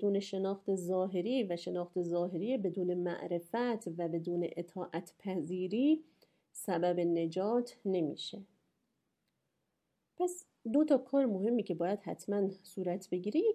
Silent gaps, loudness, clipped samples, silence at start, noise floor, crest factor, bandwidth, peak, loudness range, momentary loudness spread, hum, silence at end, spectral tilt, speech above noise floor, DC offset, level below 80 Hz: none; -35 LUFS; under 0.1%; 0 s; -83 dBFS; 18 dB; 15 kHz; -16 dBFS; 3 LU; 9 LU; none; 0 s; -6.5 dB/octave; 49 dB; under 0.1%; -84 dBFS